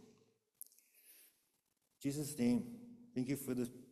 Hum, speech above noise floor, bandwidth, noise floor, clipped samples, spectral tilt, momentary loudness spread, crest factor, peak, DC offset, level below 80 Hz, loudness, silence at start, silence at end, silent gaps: none; 44 dB; 14.5 kHz; -83 dBFS; under 0.1%; -6 dB/octave; 20 LU; 18 dB; -26 dBFS; under 0.1%; -74 dBFS; -41 LUFS; 1.1 s; 0.05 s; none